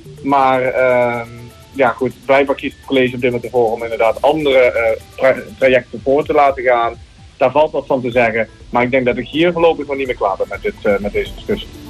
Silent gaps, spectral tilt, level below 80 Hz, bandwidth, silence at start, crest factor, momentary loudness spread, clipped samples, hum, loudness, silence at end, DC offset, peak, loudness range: none; -6 dB/octave; -40 dBFS; 13 kHz; 0.05 s; 14 dB; 8 LU; under 0.1%; none; -15 LUFS; 0 s; under 0.1%; -2 dBFS; 2 LU